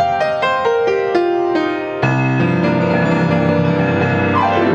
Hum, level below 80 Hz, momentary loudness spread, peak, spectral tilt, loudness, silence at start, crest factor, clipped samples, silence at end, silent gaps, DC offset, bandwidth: none; -50 dBFS; 2 LU; 0 dBFS; -7.5 dB/octave; -15 LUFS; 0 s; 14 dB; under 0.1%; 0 s; none; under 0.1%; 8.2 kHz